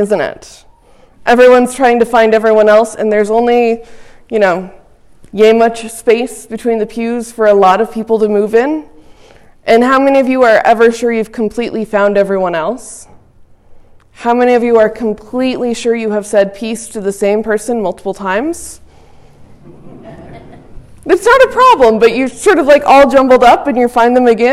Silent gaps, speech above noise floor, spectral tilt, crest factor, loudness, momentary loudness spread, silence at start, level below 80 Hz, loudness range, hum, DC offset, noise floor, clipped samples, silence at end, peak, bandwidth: none; 33 dB; -4.5 dB/octave; 10 dB; -10 LUFS; 13 LU; 0 s; -42 dBFS; 8 LU; none; under 0.1%; -43 dBFS; under 0.1%; 0 s; 0 dBFS; 14 kHz